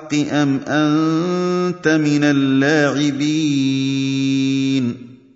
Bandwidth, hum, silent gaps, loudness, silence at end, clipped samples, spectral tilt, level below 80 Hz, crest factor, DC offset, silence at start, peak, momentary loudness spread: 7.8 kHz; none; none; -17 LUFS; 0.2 s; under 0.1%; -5.5 dB/octave; -62 dBFS; 14 dB; under 0.1%; 0 s; -2 dBFS; 4 LU